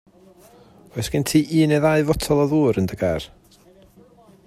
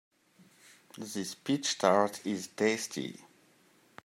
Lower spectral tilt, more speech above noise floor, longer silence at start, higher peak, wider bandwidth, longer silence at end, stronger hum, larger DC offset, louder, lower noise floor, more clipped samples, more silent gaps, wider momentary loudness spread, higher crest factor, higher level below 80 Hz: first, -6 dB/octave vs -3.5 dB/octave; about the same, 32 dB vs 33 dB; about the same, 0.95 s vs 0.95 s; first, -4 dBFS vs -10 dBFS; about the same, 15.5 kHz vs 16 kHz; first, 1.2 s vs 0.85 s; neither; neither; first, -20 LUFS vs -31 LUFS; second, -51 dBFS vs -65 dBFS; neither; neither; second, 12 LU vs 18 LU; second, 18 dB vs 24 dB; first, -44 dBFS vs -82 dBFS